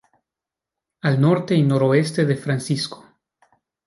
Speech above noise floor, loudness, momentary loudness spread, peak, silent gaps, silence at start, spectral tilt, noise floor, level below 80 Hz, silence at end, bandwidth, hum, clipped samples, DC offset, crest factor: 69 dB; -20 LUFS; 8 LU; -4 dBFS; none; 1.05 s; -6.5 dB/octave; -87 dBFS; -64 dBFS; 0.9 s; 11.5 kHz; none; under 0.1%; under 0.1%; 18 dB